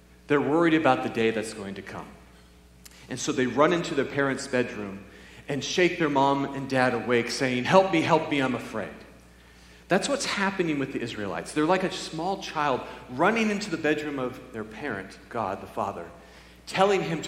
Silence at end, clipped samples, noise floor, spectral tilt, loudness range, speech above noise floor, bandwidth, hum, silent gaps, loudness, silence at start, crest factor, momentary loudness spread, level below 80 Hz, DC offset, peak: 0 s; under 0.1%; -53 dBFS; -5 dB/octave; 5 LU; 27 dB; 15.5 kHz; none; none; -26 LUFS; 0.3 s; 22 dB; 16 LU; -56 dBFS; under 0.1%; -4 dBFS